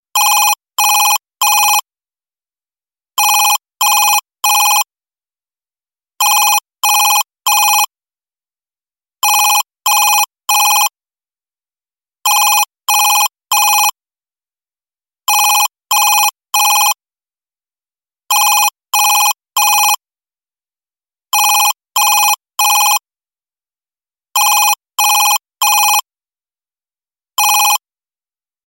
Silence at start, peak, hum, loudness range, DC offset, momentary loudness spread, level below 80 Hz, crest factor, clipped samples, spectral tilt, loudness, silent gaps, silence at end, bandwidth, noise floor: 0.15 s; 0 dBFS; none; 0 LU; under 0.1%; 5 LU; under -90 dBFS; 14 dB; under 0.1%; 7.5 dB/octave; -11 LUFS; none; 0.9 s; 17 kHz; under -90 dBFS